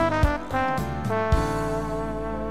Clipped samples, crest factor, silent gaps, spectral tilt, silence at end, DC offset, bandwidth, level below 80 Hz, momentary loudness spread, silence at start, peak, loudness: under 0.1%; 16 dB; none; -6.5 dB/octave; 0 s; 1%; 16 kHz; -32 dBFS; 6 LU; 0 s; -8 dBFS; -26 LUFS